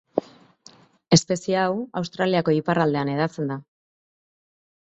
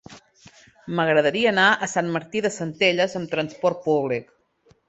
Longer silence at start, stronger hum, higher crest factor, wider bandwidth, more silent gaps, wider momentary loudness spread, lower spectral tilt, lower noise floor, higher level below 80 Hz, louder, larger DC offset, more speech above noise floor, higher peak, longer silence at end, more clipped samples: about the same, 0.15 s vs 0.1 s; neither; about the same, 22 dB vs 20 dB; about the same, 8.2 kHz vs 8.2 kHz; neither; about the same, 10 LU vs 9 LU; about the same, -5 dB/octave vs -4.5 dB/octave; second, -53 dBFS vs -60 dBFS; about the same, -62 dBFS vs -64 dBFS; about the same, -23 LUFS vs -22 LUFS; neither; second, 31 dB vs 39 dB; about the same, -2 dBFS vs -4 dBFS; first, 1.25 s vs 0.65 s; neither